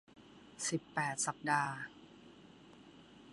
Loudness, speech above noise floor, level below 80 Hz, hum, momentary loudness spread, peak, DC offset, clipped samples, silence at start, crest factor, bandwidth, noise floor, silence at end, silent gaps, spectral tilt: -37 LUFS; 22 dB; -78 dBFS; none; 24 LU; -18 dBFS; under 0.1%; under 0.1%; 0.15 s; 24 dB; 11.5 kHz; -59 dBFS; 0 s; none; -3 dB/octave